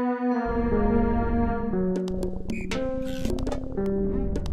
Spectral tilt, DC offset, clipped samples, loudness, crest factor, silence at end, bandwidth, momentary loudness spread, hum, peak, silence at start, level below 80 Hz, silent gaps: -7.5 dB/octave; under 0.1%; under 0.1%; -27 LUFS; 14 dB; 0 s; 13 kHz; 7 LU; none; -10 dBFS; 0 s; -32 dBFS; none